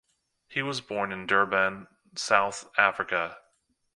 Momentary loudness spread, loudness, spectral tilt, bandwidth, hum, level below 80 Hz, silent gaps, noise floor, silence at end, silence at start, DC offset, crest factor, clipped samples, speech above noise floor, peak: 11 LU; -27 LUFS; -3 dB/octave; 11.5 kHz; none; -68 dBFS; none; -71 dBFS; 0.6 s; 0.5 s; under 0.1%; 26 dB; under 0.1%; 44 dB; -4 dBFS